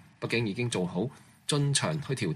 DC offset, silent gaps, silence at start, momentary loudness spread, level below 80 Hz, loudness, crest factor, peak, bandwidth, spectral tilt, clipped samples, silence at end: under 0.1%; none; 0.2 s; 8 LU; -64 dBFS; -30 LUFS; 18 dB; -12 dBFS; 13 kHz; -4.5 dB/octave; under 0.1%; 0 s